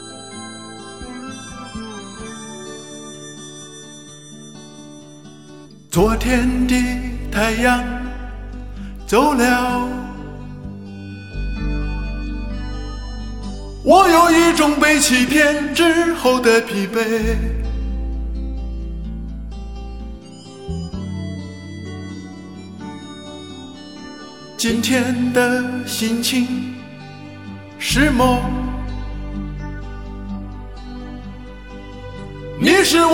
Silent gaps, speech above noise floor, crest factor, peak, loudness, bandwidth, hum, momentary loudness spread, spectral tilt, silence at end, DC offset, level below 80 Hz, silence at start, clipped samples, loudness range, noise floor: none; 26 dB; 20 dB; 0 dBFS; -18 LUFS; 16.5 kHz; none; 22 LU; -4 dB/octave; 0 s; 0.3%; -30 dBFS; 0 s; under 0.1%; 18 LU; -41 dBFS